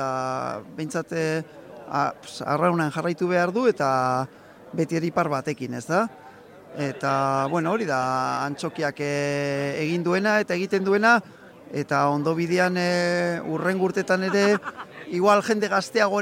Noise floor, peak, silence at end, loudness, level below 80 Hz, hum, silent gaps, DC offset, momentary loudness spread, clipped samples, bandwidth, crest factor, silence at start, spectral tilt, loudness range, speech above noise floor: -46 dBFS; -6 dBFS; 0 s; -24 LUFS; -68 dBFS; none; none; under 0.1%; 10 LU; under 0.1%; 16.5 kHz; 18 dB; 0 s; -5.5 dB/octave; 4 LU; 22 dB